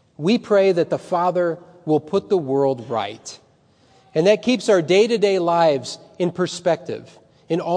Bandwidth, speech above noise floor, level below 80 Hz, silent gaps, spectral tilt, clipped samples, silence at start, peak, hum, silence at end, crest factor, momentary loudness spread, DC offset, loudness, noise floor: 10 kHz; 37 dB; -68 dBFS; none; -5.5 dB/octave; under 0.1%; 0.2 s; -4 dBFS; none; 0 s; 16 dB; 11 LU; under 0.1%; -20 LUFS; -56 dBFS